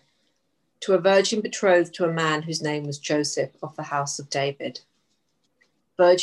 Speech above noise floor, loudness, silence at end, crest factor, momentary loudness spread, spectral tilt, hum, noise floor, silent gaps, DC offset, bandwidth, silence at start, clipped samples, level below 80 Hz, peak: 50 dB; -23 LUFS; 0 s; 18 dB; 15 LU; -4 dB/octave; none; -73 dBFS; none; under 0.1%; 12 kHz; 0.8 s; under 0.1%; -76 dBFS; -6 dBFS